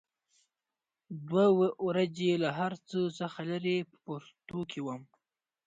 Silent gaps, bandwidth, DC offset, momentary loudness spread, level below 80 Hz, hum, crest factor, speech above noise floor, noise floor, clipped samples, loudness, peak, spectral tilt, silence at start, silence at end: none; 7.8 kHz; under 0.1%; 17 LU; -76 dBFS; none; 18 dB; over 59 dB; under -90 dBFS; under 0.1%; -32 LUFS; -14 dBFS; -7 dB/octave; 1.1 s; 0.6 s